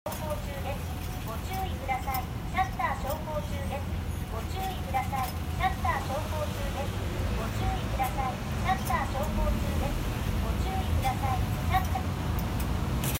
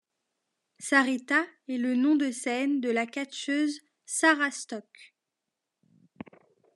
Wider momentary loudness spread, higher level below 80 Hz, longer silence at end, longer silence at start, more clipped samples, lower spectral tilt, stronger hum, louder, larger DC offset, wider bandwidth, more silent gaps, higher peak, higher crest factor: second, 6 LU vs 18 LU; first, -36 dBFS vs -88 dBFS; second, 0 s vs 1.7 s; second, 0.05 s vs 0.8 s; neither; first, -5.5 dB/octave vs -2 dB/octave; neither; second, -31 LUFS vs -27 LUFS; neither; first, 16 kHz vs 12 kHz; neither; second, -14 dBFS vs -8 dBFS; second, 16 dB vs 22 dB